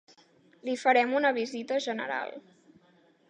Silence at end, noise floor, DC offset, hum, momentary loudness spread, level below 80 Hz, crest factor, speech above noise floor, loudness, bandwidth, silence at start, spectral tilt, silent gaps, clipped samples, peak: 0.9 s; -63 dBFS; under 0.1%; none; 17 LU; -86 dBFS; 20 dB; 35 dB; -28 LUFS; 10 kHz; 0.65 s; -3 dB/octave; none; under 0.1%; -10 dBFS